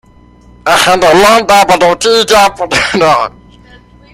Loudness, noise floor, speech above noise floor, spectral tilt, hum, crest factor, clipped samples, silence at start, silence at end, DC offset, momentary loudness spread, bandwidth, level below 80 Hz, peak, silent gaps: -7 LUFS; -40 dBFS; 32 dB; -2.5 dB/octave; 60 Hz at -40 dBFS; 10 dB; 0.2%; 0.65 s; 0.85 s; under 0.1%; 6 LU; 17 kHz; -38 dBFS; 0 dBFS; none